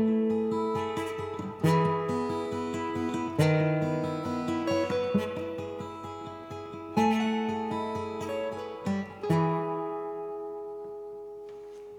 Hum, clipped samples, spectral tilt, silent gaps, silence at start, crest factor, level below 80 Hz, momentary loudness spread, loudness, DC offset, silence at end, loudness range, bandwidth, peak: none; under 0.1%; -7 dB/octave; none; 0 s; 18 dB; -68 dBFS; 14 LU; -30 LUFS; under 0.1%; 0 s; 4 LU; 16 kHz; -12 dBFS